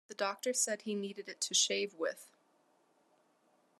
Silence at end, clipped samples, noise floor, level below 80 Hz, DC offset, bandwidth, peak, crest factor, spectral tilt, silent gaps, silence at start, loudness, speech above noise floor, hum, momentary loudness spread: 1.55 s; under 0.1%; -72 dBFS; under -90 dBFS; under 0.1%; 13.5 kHz; -16 dBFS; 22 dB; -1 dB/octave; none; 0.1 s; -34 LUFS; 36 dB; none; 10 LU